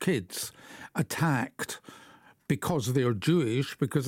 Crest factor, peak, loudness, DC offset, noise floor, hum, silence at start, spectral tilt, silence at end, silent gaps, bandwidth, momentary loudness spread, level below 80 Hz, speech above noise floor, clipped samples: 16 dB; -14 dBFS; -30 LUFS; under 0.1%; -56 dBFS; none; 0 s; -5.5 dB/octave; 0 s; none; 17 kHz; 12 LU; -64 dBFS; 27 dB; under 0.1%